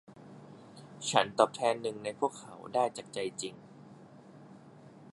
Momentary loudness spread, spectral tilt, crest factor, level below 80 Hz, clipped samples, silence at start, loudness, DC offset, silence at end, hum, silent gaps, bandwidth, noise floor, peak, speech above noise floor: 26 LU; -3.5 dB/octave; 28 dB; -80 dBFS; under 0.1%; 0.1 s; -32 LUFS; under 0.1%; 0.05 s; none; none; 11.5 kHz; -54 dBFS; -8 dBFS; 22 dB